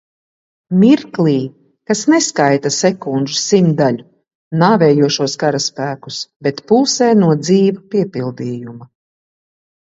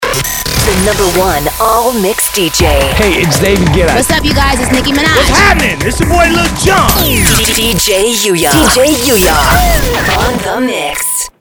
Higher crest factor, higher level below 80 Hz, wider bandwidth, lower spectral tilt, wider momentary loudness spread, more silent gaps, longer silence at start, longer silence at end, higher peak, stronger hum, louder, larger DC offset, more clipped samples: about the same, 14 dB vs 10 dB; second, -60 dBFS vs -18 dBFS; second, 8 kHz vs over 20 kHz; first, -5 dB/octave vs -3.5 dB/octave; first, 12 LU vs 5 LU; first, 4.35-4.51 s, 6.36-6.40 s vs none; first, 0.7 s vs 0 s; first, 1.05 s vs 0.1 s; about the same, 0 dBFS vs 0 dBFS; neither; second, -14 LUFS vs -9 LUFS; neither; second, under 0.1% vs 0.3%